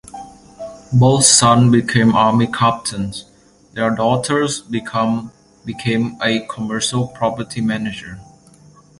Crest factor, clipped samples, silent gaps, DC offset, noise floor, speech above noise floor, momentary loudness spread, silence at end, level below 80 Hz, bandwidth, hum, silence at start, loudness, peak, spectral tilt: 18 dB; under 0.1%; none; under 0.1%; -46 dBFS; 31 dB; 23 LU; 0.75 s; -48 dBFS; 11.5 kHz; none; 0.15 s; -16 LUFS; 0 dBFS; -4.5 dB/octave